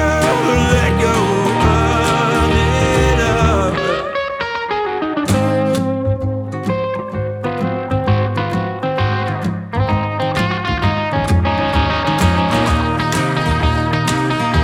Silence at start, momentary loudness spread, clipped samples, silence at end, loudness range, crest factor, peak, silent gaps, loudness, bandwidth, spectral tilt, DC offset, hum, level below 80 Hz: 0 s; 7 LU; under 0.1%; 0 s; 5 LU; 14 dB; -2 dBFS; none; -16 LUFS; 16.5 kHz; -6 dB/octave; under 0.1%; none; -26 dBFS